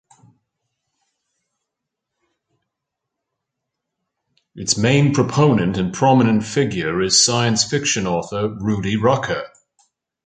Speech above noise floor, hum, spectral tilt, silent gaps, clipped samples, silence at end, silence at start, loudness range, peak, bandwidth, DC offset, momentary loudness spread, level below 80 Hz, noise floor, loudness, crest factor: 64 dB; none; -4 dB/octave; none; under 0.1%; 0.8 s; 4.55 s; 7 LU; -2 dBFS; 9.6 kHz; under 0.1%; 9 LU; -50 dBFS; -81 dBFS; -17 LUFS; 18 dB